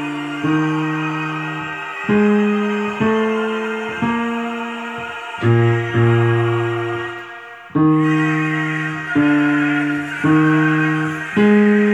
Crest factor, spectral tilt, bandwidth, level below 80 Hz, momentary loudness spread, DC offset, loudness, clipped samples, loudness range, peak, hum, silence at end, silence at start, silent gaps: 14 dB; -7.5 dB/octave; 10 kHz; -56 dBFS; 11 LU; under 0.1%; -18 LUFS; under 0.1%; 3 LU; -4 dBFS; none; 0 s; 0 s; none